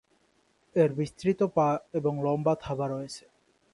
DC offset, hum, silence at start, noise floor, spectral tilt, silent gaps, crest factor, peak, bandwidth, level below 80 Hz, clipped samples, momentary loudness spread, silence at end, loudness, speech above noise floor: under 0.1%; none; 0.75 s; -68 dBFS; -7.5 dB/octave; none; 18 dB; -10 dBFS; 11.5 kHz; -62 dBFS; under 0.1%; 9 LU; 0.55 s; -28 LUFS; 41 dB